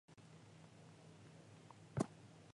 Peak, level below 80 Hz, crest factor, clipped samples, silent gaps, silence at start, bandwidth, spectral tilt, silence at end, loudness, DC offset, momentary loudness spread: -24 dBFS; -74 dBFS; 28 dB; under 0.1%; none; 0.1 s; 11 kHz; -6.5 dB/octave; 0.05 s; -51 LUFS; under 0.1%; 17 LU